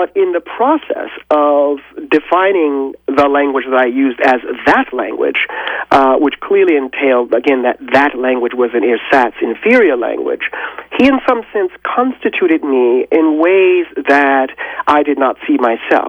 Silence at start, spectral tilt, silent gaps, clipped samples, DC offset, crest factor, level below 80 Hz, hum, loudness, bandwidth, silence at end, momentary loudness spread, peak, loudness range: 0 s; -5.5 dB/octave; none; under 0.1%; under 0.1%; 12 dB; -50 dBFS; none; -13 LUFS; 19.5 kHz; 0 s; 7 LU; 0 dBFS; 2 LU